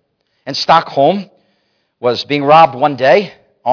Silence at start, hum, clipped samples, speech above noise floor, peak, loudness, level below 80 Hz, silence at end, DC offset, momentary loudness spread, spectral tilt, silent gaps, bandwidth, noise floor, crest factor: 0.45 s; none; 0.2%; 51 dB; 0 dBFS; -12 LUFS; -58 dBFS; 0 s; under 0.1%; 14 LU; -5.5 dB/octave; none; 5.4 kHz; -62 dBFS; 14 dB